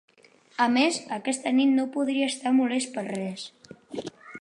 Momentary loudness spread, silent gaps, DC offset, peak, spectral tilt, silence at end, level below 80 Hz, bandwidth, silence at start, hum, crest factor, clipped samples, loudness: 17 LU; none; under 0.1%; -8 dBFS; -3.5 dB/octave; 0 s; -76 dBFS; 11 kHz; 0.6 s; none; 18 dB; under 0.1%; -25 LUFS